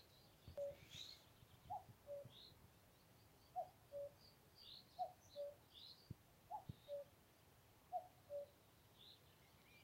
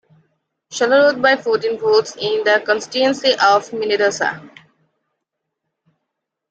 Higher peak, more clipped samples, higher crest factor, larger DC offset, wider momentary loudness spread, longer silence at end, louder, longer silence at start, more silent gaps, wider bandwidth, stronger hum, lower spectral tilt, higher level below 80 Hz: second, -38 dBFS vs -2 dBFS; neither; about the same, 20 dB vs 16 dB; neither; first, 15 LU vs 8 LU; second, 0 s vs 2.05 s; second, -56 LUFS vs -16 LUFS; second, 0 s vs 0.7 s; neither; first, 16 kHz vs 9 kHz; neither; first, -4.5 dB/octave vs -2.5 dB/octave; second, -78 dBFS vs -66 dBFS